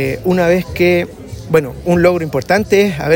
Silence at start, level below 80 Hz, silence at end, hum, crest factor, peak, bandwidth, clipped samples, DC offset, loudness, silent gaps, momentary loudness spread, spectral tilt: 0 s; -38 dBFS; 0 s; none; 14 dB; 0 dBFS; 16.5 kHz; under 0.1%; under 0.1%; -14 LUFS; none; 5 LU; -6.5 dB/octave